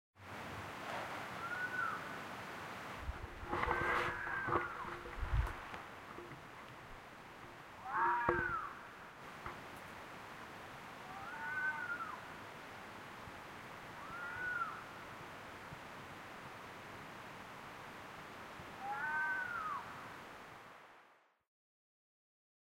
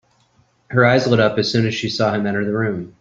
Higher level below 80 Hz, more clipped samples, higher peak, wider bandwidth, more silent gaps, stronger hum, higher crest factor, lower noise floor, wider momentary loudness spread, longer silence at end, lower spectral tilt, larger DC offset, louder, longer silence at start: about the same, -56 dBFS vs -54 dBFS; neither; second, -18 dBFS vs -2 dBFS; first, 16 kHz vs 7.6 kHz; neither; neither; first, 26 dB vs 16 dB; first, -68 dBFS vs -59 dBFS; first, 15 LU vs 7 LU; first, 1.45 s vs 0.1 s; about the same, -5 dB/octave vs -6 dB/octave; neither; second, -43 LUFS vs -18 LUFS; second, 0.15 s vs 0.7 s